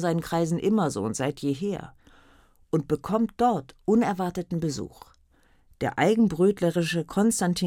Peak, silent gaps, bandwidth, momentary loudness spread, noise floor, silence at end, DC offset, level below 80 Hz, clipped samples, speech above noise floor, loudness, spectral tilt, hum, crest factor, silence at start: -8 dBFS; none; 16.5 kHz; 9 LU; -61 dBFS; 0 s; under 0.1%; -56 dBFS; under 0.1%; 36 dB; -26 LUFS; -6 dB/octave; none; 16 dB; 0 s